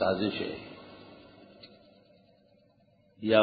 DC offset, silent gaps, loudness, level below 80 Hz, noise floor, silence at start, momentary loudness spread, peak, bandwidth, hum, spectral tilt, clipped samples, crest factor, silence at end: under 0.1%; none; -32 LUFS; -64 dBFS; -65 dBFS; 0 s; 25 LU; -8 dBFS; 4.9 kHz; none; -3.5 dB/octave; under 0.1%; 24 dB; 0 s